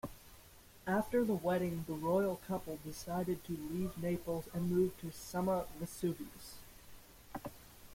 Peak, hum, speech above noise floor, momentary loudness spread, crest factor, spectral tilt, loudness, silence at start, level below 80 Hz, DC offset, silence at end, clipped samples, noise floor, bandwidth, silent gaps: -22 dBFS; none; 22 dB; 22 LU; 16 dB; -6.5 dB/octave; -38 LUFS; 0.05 s; -60 dBFS; under 0.1%; 0 s; under 0.1%; -59 dBFS; 16.5 kHz; none